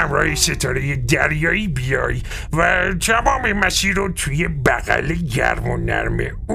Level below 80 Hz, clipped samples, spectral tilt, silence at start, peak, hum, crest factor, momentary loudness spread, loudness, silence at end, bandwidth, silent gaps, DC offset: -28 dBFS; under 0.1%; -4 dB/octave; 0 s; 0 dBFS; none; 18 dB; 6 LU; -18 LUFS; 0 s; 15.5 kHz; none; under 0.1%